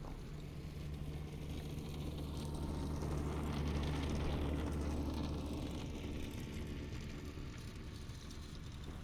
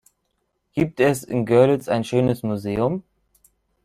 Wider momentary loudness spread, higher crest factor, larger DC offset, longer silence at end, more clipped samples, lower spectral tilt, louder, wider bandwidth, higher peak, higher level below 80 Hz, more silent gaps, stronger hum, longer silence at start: about the same, 10 LU vs 9 LU; about the same, 14 dB vs 18 dB; neither; second, 0 s vs 0.85 s; neither; about the same, -6.5 dB/octave vs -7 dB/octave; second, -44 LUFS vs -21 LUFS; about the same, 15 kHz vs 15.5 kHz; second, -28 dBFS vs -4 dBFS; first, -48 dBFS vs -54 dBFS; neither; neither; second, 0 s vs 0.75 s